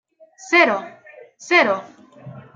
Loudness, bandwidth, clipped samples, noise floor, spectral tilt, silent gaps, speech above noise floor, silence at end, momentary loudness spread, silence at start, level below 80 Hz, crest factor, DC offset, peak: -17 LUFS; 7.6 kHz; under 0.1%; -40 dBFS; -3.5 dB/octave; none; 23 dB; 0.15 s; 12 LU; 0.45 s; -78 dBFS; 20 dB; under 0.1%; -2 dBFS